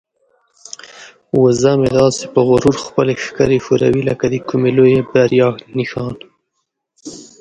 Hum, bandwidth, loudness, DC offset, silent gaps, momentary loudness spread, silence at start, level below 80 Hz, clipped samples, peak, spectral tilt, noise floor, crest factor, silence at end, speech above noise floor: none; 9.4 kHz; -14 LUFS; under 0.1%; none; 21 LU; 0.95 s; -46 dBFS; under 0.1%; 0 dBFS; -6 dB/octave; -72 dBFS; 16 dB; 0.2 s; 59 dB